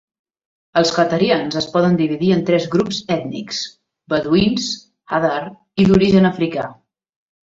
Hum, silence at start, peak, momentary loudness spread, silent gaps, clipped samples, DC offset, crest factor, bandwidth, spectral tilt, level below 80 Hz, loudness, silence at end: none; 0.75 s; -2 dBFS; 12 LU; none; under 0.1%; under 0.1%; 16 dB; 7.8 kHz; -6 dB/octave; -46 dBFS; -17 LUFS; 0.8 s